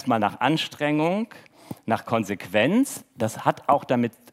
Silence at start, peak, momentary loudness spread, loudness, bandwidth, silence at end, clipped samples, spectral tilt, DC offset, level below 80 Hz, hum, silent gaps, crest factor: 0 s; -4 dBFS; 8 LU; -24 LUFS; 16 kHz; 0.2 s; under 0.1%; -5.5 dB/octave; under 0.1%; -72 dBFS; none; none; 20 dB